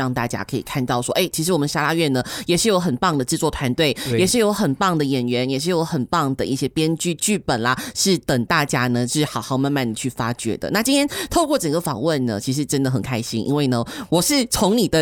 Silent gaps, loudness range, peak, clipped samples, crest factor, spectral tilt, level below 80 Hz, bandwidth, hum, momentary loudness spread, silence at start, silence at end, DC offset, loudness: none; 2 LU; -4 dBFS; under 0.1%; 16 dB; -4.5 dB/octave; -46 dBFS; 18.5 kHz; none; 6 LU; 0 s; 0 s; under 0.1%; -20 LUFS